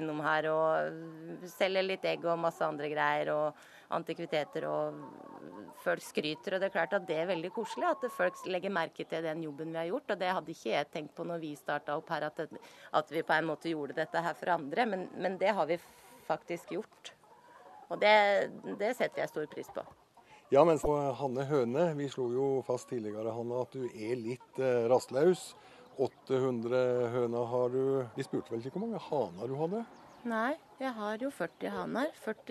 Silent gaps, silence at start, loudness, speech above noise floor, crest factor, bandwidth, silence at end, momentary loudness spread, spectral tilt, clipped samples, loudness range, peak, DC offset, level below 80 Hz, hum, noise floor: none; 0 s; -33 LUFS; 27 dB; 22 dB; 13.5 kHz; 0 s; 11 LU; -5.5 dB/octave; under 0.1%; 5 LU; -12 dBFS; under 0.1%; -68 dBFS; none; -60 dBFS